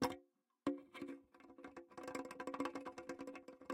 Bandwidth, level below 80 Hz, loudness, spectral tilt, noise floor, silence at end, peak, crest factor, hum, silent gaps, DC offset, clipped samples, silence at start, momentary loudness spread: 16.5 kHz; -76 dBFS; -49 LUFS; -4.5 dB/octave; -70 dBFS; 0 s; -24 dBFS; 24 dB; none; none; under 0.1%; under 0.1%; 0 s; 12 LU